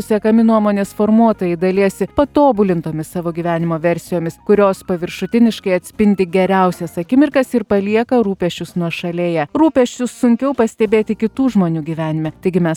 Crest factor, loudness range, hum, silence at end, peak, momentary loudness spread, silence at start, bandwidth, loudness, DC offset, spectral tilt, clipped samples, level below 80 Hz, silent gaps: 14 dB; 2 LU; none; 0 s; 0 dBFS; 8 LU; 0 s; 16 kHz; -16 LUFS; under 0.1%; -7 dB/octave; under 0.1%; -46 dBFS; none